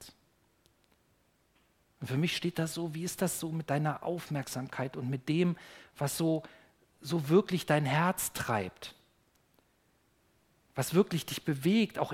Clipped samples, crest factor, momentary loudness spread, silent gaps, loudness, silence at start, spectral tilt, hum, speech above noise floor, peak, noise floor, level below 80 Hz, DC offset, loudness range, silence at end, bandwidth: under 0.1%; 22 dB; 10 LU; none; -32 LUFS; 0 s; -5.5 dB/octave; none; 39 dB; -12 dBFS; -71 dBFS; -68 dBFS; under 0.1%; 5 LU; 0 s; 16.5 kHz